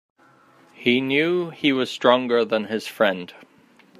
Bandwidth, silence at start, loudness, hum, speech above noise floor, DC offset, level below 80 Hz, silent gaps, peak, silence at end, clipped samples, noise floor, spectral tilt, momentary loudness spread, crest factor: 15 kHz; 0.8 s; -21 LUFS; none; 33 dB; under 0.1%; -70 dBFS; none; -2 dBFS; 0.7 s; under 0.1%; -54 dBFS; -5 dB/octave; 8 LU; 22 dB